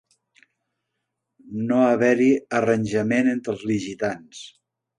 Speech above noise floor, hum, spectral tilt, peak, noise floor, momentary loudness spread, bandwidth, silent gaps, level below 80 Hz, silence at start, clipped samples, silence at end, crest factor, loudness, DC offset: 59 dB; none; -6.5 dB/octave; -6 dBFS; -80 dBFS; 18 LU; 10 kHz; none; -62 dBFS; 1.45 s; under 0.1%; 0.5 s; 18 dB; -21 LUFS; under 0.1%